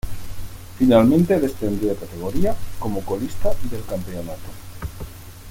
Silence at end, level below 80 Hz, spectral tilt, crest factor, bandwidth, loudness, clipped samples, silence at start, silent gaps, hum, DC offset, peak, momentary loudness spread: 0 s; -36 dBFS; -7 dB/octave; 18 dB; 17 kHz; -21 LUFS; under 0.1%; 0.05 s; none; none; under 0.1%; -2 dBFS; 22 LU